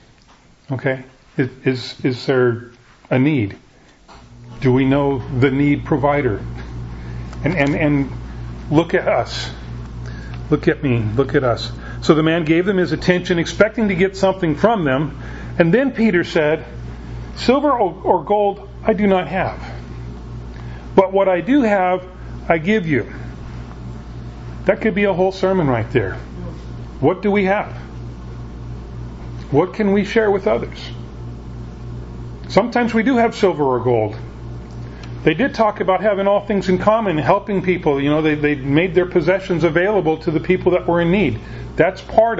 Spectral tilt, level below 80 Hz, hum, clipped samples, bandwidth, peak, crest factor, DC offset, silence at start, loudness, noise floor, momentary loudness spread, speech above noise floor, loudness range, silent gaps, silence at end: -7 dB/octave; -36 dBFS; none; under 0.1%; 8 kHz; 0 dBFS; 18 dB; under 0.1%; 0.7 s; -17 LUFS; -49 dBFS; 17 LU; 32 dB; 4 LU; none; 0 s